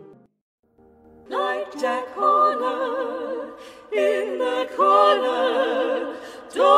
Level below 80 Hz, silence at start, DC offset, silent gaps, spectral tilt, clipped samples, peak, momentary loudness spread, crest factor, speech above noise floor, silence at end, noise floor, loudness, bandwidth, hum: -68 dBFS; 0 s; under 0.1%; 0.41-0.63 s; -3 dB/octave; under 0.1%; -2 dBFS; 14 LU; 20 dB; 31 dB; 0 s; -53 dBFS; -22 LUFS; 13.5 kHz; none